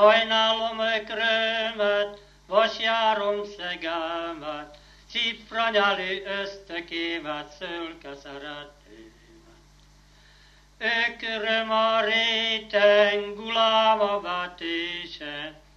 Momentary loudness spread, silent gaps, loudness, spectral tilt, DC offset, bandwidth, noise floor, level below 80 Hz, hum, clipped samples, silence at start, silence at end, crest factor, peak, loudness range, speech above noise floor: 15 LU; none; -24 LUFS; -3 dB/octave; under 0.1%; 7.6 kHz; -55 dBFS; -58 dBFS; 50 Hz at -55 dBFS; under 0.1%; 0 s; 0.25 s; 22 dB; -4 dBFS; 13 LU; 30 dB